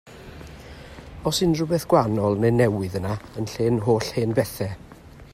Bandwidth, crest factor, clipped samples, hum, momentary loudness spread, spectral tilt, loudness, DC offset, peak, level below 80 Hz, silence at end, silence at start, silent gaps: 15.5 kHz; 18 dB; under 0.1%; none; 22 LU; -6 dB/octave; -23 LUFS; under 0.1%; -4 dBFS; -48 dBFS; 0.05 s; 0.05 s; none